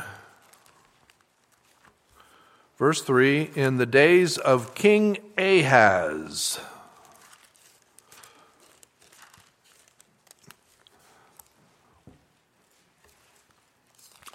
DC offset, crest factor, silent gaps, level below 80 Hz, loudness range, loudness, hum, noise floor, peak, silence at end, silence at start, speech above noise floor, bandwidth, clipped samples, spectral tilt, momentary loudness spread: under 0.1%; 26 dB; none; -70 dBFS; 13 LU; -21 LUFS; none; -65 dBFS; -2 dBFS; 7.65 s; 0 s; 44 dB; 16 kHz; under 0.1%; -4.5 dB/octave; 11 LU